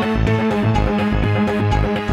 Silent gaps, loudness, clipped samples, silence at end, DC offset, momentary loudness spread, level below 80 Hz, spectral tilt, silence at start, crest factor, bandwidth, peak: none; -18 LUFS; under 0.1%; 0 s; under 0.1%; 1 LU; -26 dBFS; -7.5 dB/octave; 0 s; 12 dB; 9.8 kHz; -4 dBFS